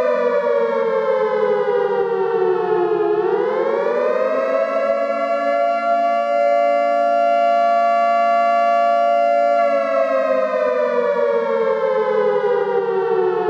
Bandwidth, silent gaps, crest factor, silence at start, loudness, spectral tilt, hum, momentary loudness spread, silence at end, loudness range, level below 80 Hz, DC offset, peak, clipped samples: 8 kHz; none; 10 dB; 0 s; -17 LUFS; -6 dB/octave; none; 3 LU; 0 s; 3 LU; -70 dBFS; under 0.1%; -8 dBFS; under 0.1%